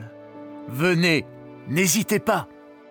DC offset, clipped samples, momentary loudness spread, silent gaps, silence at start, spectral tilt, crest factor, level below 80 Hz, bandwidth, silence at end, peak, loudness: under 0.1%; under 0.1%; 21 LU; none; 0 s; -4 dB/octave; 18 dB; -66 dBFS; over 20 kHz; 0.2 s; -8 dBFS; -22 LUFS